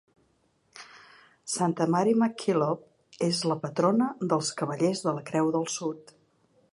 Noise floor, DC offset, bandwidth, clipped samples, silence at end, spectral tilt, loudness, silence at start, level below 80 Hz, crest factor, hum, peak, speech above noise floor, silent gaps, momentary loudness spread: -69 dBFS; under 0.1%; 11.5 kHz; under 0.1%; 0.7 s; -5 dB/octave; -27 LUFS; 0.75 s; -76 dBFS; 20 dB; none; -10 dBFS; 42 dB; none; 19 LU